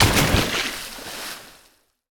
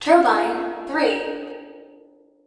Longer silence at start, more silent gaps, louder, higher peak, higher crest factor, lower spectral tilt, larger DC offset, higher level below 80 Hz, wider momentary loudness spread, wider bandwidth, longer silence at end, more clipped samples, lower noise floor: about the same, 0 s vs 0 s; neither; about the same, -22 LUFS vs -21 LUFS; about the same, 0 dBFS vs -2 dBFS; about the same, 22 dB vs 20 dB; about the same, -3.5 dB/octave vs -3.5 dB/octave; neither; first, -34 dBFS vs -62 dBFS; second, 16 LU vs 19 LU; first, over 20 kHz vs 10.5 kHz; about the same, 0.6 s vs 0.6 s; neither; first, -59 dBFS vs -52 dBFS